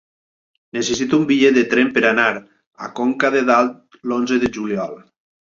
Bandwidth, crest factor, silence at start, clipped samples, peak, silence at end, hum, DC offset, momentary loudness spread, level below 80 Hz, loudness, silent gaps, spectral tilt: 7.6 kHz; 16 dB; 0.75 s; under 0.1%; -2 dBFS; 0.6 s; none; under 0.1%; 16 LU; -56 dBFS; -17 LUFS; 2.67-2.71 s; -4.5 dB/octave